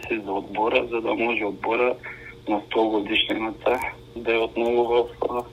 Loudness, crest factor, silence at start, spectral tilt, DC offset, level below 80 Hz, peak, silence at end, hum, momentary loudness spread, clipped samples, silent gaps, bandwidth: -24 LUFS; 20 dB; 0 s; -5 dB/octave; under 0.1%; -52 dBFS; -6 dBFS; 0 s; none; 7 LU; under 0.1%; none; 15 kHz